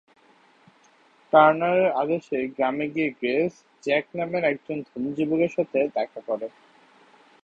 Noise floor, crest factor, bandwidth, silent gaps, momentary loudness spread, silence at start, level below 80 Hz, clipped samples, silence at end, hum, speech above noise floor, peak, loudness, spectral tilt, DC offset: -58 dBFS; 22 dB; 7.8 kHz; none; 13 LU; 1.35 s; -68 dBFS; under 0.1%; 0.95 s; none; 35 dB; -2 dBFS; -24 LUFS; -7 dB/octave; under 0.1%